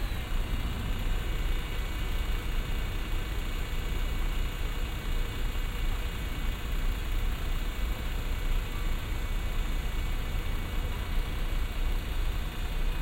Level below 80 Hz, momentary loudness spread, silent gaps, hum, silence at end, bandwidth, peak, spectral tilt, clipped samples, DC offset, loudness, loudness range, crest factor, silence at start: -30 dBFS; 1 LU; none; none; 0 s; 16.5 kHz; -18 dBFS; -5 dB/octave; under 0.1%; under 0.1%; -35 LUFS; 0 LU; 12 dB; 0 s